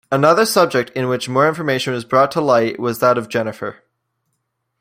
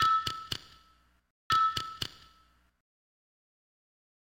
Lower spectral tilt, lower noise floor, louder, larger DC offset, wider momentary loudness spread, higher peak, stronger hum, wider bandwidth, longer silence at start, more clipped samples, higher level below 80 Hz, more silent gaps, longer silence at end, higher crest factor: first, -5 dB/octave vs -2 dB/octave; first, -73 dBFS vs -66 dBFS; first, -16 LUFS vs -31 LUFS; neither; second, 9 LU vs 12 LU; first, -2 dBFS vs -16 dBFS; neither; about the same, 16 kHz vs 16.5 kHz; about the same, 0.1 s vs 0 s; neither; about the same, -62 dBFS vs -64 dBFS; second, none vs 1.30-1.50 s; second, 1.1 s vs 2.15 s; about the same, 16 dB vs 20 dB